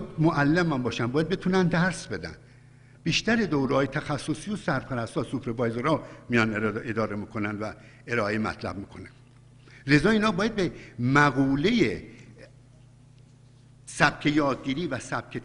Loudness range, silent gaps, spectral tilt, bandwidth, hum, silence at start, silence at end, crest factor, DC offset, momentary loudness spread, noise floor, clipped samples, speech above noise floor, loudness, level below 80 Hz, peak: 5 LU; none; -6 dB/octave; 11 kHz; none; 0 s; 0 s; 22 dB; under 0.1%; 13 LU; -53 dBFS; under 0.1%; 27 dB; -26 LUFS; -52 dBFS; -4 dBFS